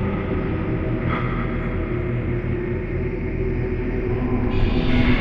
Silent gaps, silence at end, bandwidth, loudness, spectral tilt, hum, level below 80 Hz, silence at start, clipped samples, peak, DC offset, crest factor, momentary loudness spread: none; 0 s; 5.6 kHz; -24 LUFS; -9.5 dB/octave; none; -26 dBFS; 0 s; under 0.1%; -6 dBFS; under 0.1%; 16 dB; 4 LU